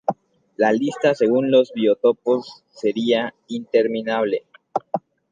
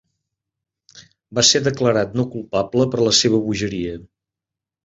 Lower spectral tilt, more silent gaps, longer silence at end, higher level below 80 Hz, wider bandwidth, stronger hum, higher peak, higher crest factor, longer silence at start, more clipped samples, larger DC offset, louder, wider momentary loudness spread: first, -6 dB/octave vs -3.5 dB/octave; neither; second, 0.35 s vs 0.8 s; second, -72 dBFS vs -50 dBFS; about the same, 9 kHz vs 8.2 kHz; neither; second, -4 dBFS vs 0 dBFS; about the same, 16 dB vs 20 dB; second, 0.1 s vs 0.95 s; neither; neither; second, -21 LUFS vs -18 LUFS; about the same, 12 LU vs 13 LU